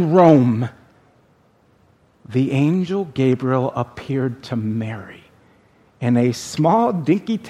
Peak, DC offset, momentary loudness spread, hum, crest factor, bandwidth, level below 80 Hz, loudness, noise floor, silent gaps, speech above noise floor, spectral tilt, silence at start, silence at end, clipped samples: 0 dBFS; under 0.1%; 12 LU; none; 20 dB; 13.5 kHz; -60 dBFS; -19 LUFS; -56 dBFS; none; 39 dB; -7.5 dB/octave; 0 s; 0 s; under 0.1%